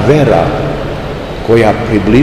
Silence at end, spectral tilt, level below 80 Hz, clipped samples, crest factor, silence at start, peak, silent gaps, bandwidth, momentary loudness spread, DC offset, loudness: 0 s; -7.5 dB/octave; -26 dBFS; 2%; 10 dB; 0 s; 0 dBFS; none; 14 kHz; 11 LU; 1%; -11 LUFS